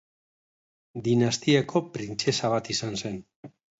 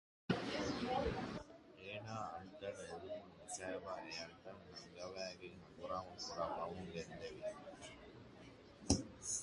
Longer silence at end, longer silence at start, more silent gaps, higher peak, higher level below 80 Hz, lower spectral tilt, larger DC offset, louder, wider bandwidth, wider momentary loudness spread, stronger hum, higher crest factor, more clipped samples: first, 0.3 s vs 0 s; first, 0.95 s vs 0.3 s; first, 3.36-3.43 s vs none; first, -8 dBFS vs -16 dBFS; about the same, -62 dBFS vs -60 dBFS; about the same, -5 dB/octave vs -4 dB/octave; neither; first, -26 LUFS vs -46 LUFS; second, 8 kHz vs 11.5 kHz; second, 12 LU vs 16 LU; neither; second, 20 dB vs 30 dB; neither